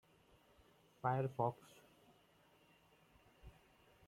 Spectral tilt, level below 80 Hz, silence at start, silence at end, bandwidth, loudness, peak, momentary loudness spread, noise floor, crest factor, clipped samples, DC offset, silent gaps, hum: -8 dB/octave; -74 dBFS; 1.05 s; 0.55 s; 15.5 kHz; -41 LUFS; -24 dBFS; 25 LU; -71 dBFS; 24 dB; under 0.1%; under 0.1%; none; none